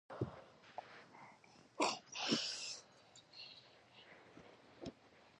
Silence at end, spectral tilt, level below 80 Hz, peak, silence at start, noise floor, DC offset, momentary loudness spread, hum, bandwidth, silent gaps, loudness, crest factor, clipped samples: 0.1 s; -3 dB/octave; -76 dBFS; -20 dBFS; 0.1 s; -65 dBFS; under 0.1%; 24 LU; none; 11 kHz; none; -43 LUFS; 26 dB; under 0.1%